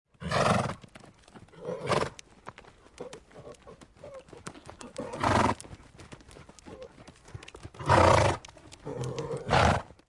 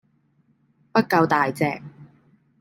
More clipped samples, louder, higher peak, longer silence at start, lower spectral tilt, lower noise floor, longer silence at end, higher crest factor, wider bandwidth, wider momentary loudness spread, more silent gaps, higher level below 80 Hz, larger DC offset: neither; second, -27 LUFS vs -21 LUFS; second, -8 dBFS vs -4 dBFS; second, 0.2 s vs 0.95 s; second, -5 dB/octave vs -6.5 dB/octave; second, -54 dBFS vs -64 dBFS; second, 0.25 s vs 0.55 s; about the same, 22 dB vs 20 dB; second, 11.5 kHz vs 16 kHz; first, 25 LU vs 7 LU; neither; first, -50 dBFS vs -66 dBFS; neither